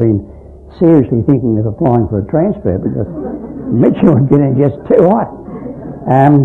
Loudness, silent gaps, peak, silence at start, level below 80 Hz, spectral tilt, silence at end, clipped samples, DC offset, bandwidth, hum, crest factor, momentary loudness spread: -12 LUFS; none; 0 dBFS; 0 s; -38 dBFS; -11.5 dB/octave; 0 s; 0.3%; under 0.1%; 4.2 kHz; none; 12 dB; 14 LU